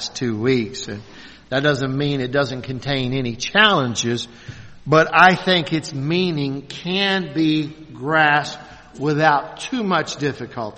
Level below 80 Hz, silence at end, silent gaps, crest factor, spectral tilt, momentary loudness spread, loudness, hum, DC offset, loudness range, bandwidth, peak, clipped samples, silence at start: -52 dBFS; 0 s; none; 20 dB; -4.5 dB/octave; 16 LU; -19 LUFS; none; under 0.1%; 3 LU; 8.8 kHz; 0 dBFS; under 0.1%; 0 s